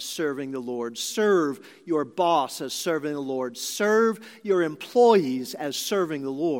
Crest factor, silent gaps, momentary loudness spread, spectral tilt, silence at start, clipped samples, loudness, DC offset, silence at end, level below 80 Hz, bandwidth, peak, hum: 20 dB; none; 10 LU; -4 dB/octave; 0 s; under 0.1%; -25 LUFS; under 0.1%; 0 s; -82 dBFS; 17 kHz; -6 dBFS; none